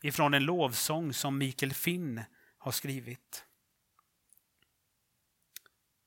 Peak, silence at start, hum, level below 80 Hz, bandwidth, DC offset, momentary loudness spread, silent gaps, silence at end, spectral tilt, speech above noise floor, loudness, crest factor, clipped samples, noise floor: -12 dBFS; 0 s; none; -76 dBFS; 17.5 kHz; under 0.1%; 24 LU; none; 2.65 s; -4 dB/octave; 45 dB; -32 LUFS; 24 dB; under 0.1%; -78 dBFS